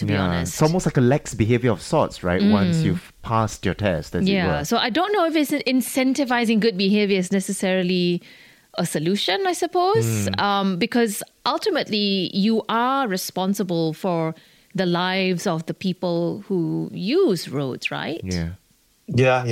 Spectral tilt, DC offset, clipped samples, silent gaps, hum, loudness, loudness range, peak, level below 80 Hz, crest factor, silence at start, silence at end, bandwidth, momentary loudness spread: -5.5 dB/octave; under 0.1%; under 0.1%; none; none; -21 LUFS; 3 LU; -6 dBFS; -48 dBFS; 14 dB; 0 s; 0 s; 16 kHz; 7 LU